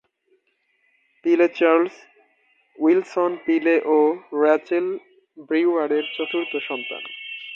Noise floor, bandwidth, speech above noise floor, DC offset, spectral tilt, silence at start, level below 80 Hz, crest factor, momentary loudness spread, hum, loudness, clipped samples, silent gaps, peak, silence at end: -68 dBFS; 7 kHz; 48 dB; under 0.1%; -5.5 dB/octave; 1.25 s; -78 dBFS; 18 dB; 11 LU; none; -21 LUFS; under 0.1%; none; -4 dBFS; 0 s